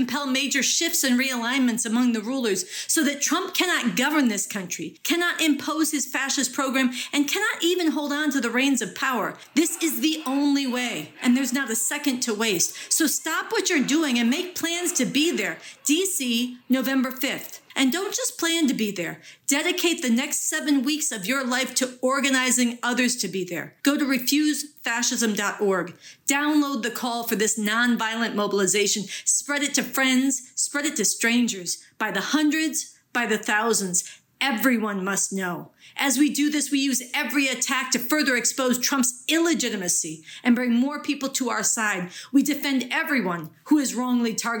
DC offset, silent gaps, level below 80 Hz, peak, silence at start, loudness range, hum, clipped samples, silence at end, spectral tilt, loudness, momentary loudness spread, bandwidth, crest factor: under 0.1%; none; -82 dBFS; -8 dBFS; 0 s; 2 LU; none; under 0.1%; 0 s; -2 dB/octave; -23 LUFS; 6 LU; over 20 kHz; 16 dB